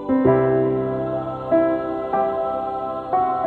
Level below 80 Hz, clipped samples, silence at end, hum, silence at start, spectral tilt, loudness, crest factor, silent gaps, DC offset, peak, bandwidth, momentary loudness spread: -50 dBFS; under 0.1%; 0 s; 50 Hz at -60 dBFS; 0 s; -10.5 dB/octave; -21 LUFS; 14 dB; none; under 0.1%; -6 dBFS; 4.4 kHz; 8 LU